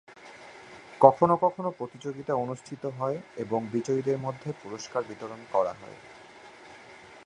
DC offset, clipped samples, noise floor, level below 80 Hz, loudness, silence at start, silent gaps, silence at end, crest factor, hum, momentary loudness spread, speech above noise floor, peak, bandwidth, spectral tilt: under 0.1%; under 0.1%; -50 dBFS; -70 dBFS; -28 LUFS; 0.1 s; none; 0.05 s; 28 dB; none; 26 LU; 22 dB; -2 dBFS; 10.5 kHz; -7 dB/octave